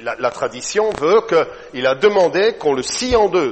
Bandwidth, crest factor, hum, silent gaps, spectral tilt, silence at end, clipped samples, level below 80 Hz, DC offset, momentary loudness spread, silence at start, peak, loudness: 8.8 kHz; 16 dB; none; none; -3.5 dB/octave; 0 s; under 0.1%; -44 dBFS; under 0.1%; 7 LU; 0 s; 0 dBFS; -17 LUFS